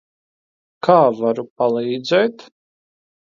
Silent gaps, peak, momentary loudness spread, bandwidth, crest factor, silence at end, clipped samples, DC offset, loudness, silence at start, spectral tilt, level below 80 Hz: 1.50-1.56 s; 0 dBFS; 8 LU; 7.4 kHz; 20 dB; 1 s; under 0.1%; under 0.1%; -18 LUFS; 0.85 s; -6.5 dB/octave; -72 dBFS